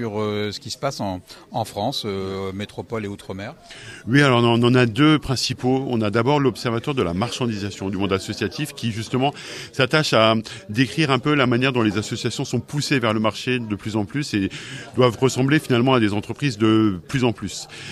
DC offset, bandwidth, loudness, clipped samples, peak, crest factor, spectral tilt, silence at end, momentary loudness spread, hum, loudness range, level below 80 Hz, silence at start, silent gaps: under 0.1%; 14 kHz; -21 LUFS; under 0.1%; -2 dBFS; 20 dB; -5.5 dB/octave; 0 s; 13 LU; none; 5 LU; -52 dBFS; 0 s; none